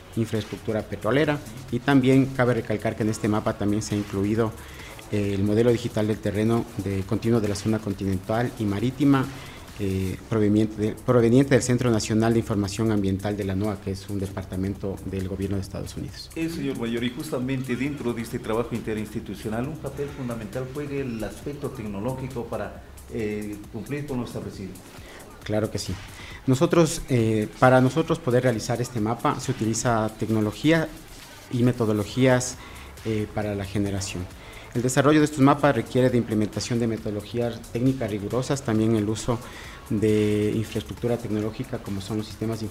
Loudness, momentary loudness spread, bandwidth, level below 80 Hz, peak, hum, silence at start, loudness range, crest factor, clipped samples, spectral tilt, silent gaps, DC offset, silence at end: -25 LUFS; 13 LU; 16 kHz; -46 dBFS; -2 dBFS; none; 0 s; 9 LU; 22 dB; under 0.1%; -6 dB/octave; none; under 0.1%; 0 s